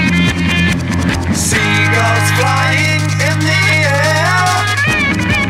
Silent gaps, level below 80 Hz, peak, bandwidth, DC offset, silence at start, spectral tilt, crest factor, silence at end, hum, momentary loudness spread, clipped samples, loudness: none; -32 dBFS; -2 dBFS; 16 kHz; under 0.1%; 0 s; -4.5 dB/octave; 10 dB; 0 s; none; 3 LU; under 0.1%; -12 LUFS